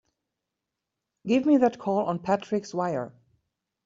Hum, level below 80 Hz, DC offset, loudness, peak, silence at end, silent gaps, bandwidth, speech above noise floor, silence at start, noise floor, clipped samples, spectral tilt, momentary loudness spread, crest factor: none; -70 dBFS; under 0.1%; -26 LUFS; -10 dBFS; 0.75 s; none; 7.6 kHz; 60 dB; 1.25 s; -85 dBFS; under 0.1%; -6 dB/octave; 11 LU; 18 dB